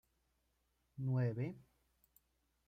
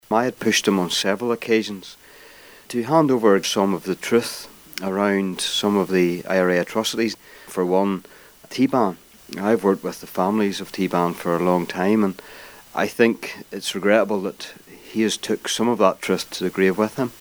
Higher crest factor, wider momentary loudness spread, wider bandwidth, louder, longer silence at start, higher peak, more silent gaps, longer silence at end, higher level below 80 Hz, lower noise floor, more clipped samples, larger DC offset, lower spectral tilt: about the same, 16 dB vs 20 dB; first, 21 LU vs 12 LU; second, 14.5 kHz vs over 20 kHz; second, -40 LUFS vs -21 LUFS; first, 0.95 s vs 0.1 s; second, -28 dBFS vs -2 dBFS; neither; first, 1.05 s vs 0.05 s; second, -76 dBFS vs -62 dBFS; first, -81 dBFS vs -46 dBFS; neither; neither; first, -10 dB/octave vs -4.5 dB/octave